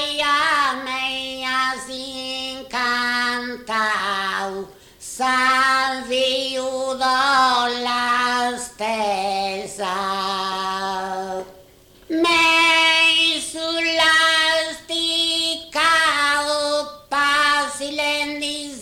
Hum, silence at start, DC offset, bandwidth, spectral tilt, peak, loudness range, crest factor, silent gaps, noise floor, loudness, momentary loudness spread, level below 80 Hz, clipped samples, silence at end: none; 0 s; under 0.1%; 19 kHz; -1 dB/octave; -8 dBFS; 7 LU; 14 dB; none; -49 dBFS; -19 LUFS; 12 LU; -56 dBFS; under 0.1%; 0 s